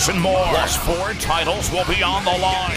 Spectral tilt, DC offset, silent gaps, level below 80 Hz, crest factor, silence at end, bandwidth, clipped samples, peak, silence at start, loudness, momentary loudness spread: -3 dB/octave; under 0.1%; none; -30 dBFS; 14 dB; 0 s; 16 kHz; under 0.1%; -4 dBFS; 0 s; -19 LUFS; 3 LU